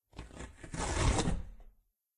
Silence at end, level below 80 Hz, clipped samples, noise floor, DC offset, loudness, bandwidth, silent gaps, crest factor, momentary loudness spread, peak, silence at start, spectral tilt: 0.5 s; -40 dBFS; under 0.1%; -64 dBFS; under 0.1%; -35 LUFS; 11.5 kHz; none; 20 dB; 19 LU; -18 dBFS; 0.15 s; -4.5 dB/octave